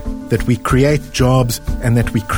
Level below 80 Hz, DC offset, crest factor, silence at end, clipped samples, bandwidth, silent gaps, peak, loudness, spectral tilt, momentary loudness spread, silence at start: -26 dBFS; under 0.1%; 14 dB; 0 s; under 0.1%; over 20 kHz; none; -2 dBFS; -15 LUFS; -6 dB/octave; 6 LU; 0 s